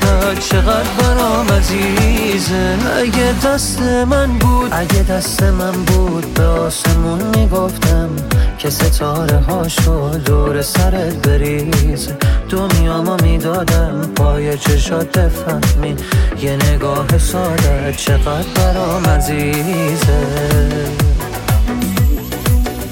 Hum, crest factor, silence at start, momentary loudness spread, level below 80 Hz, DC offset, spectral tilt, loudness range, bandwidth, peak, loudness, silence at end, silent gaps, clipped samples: none; 12 dB; 0 s; 3 LU; -18 dBFS; under 0.1%; -5.5 dB/octave; 1 LU; 17 kHz; 0 dBFS; -14 LUFS; 0 s; none; under 0.1%